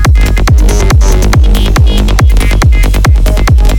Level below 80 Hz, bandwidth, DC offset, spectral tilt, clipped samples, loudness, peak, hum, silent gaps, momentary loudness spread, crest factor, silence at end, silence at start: -6 dBFS; 17 kHz; 0.7%; -5.5 dB/octave; 2%; -8 LUFS; 0 dBFS; none; none; 1 LU; 4 dB; 0 s; 0 s